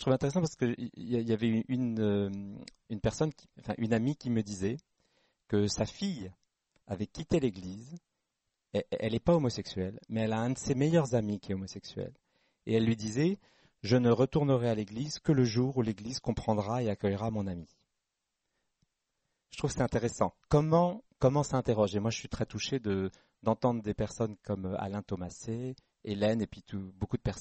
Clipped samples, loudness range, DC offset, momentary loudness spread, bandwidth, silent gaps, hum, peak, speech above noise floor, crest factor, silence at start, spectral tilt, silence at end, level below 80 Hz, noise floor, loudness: under 0.1%; 6 LU; under 0.1%; 14 LU; 8.4 kHz; none; none; -12 dBFS; 54 dB; 20 dB; 0 s; -6.5 dB/octave; 0 s; -54 dBFS; -86 dBFS; -32 LUFS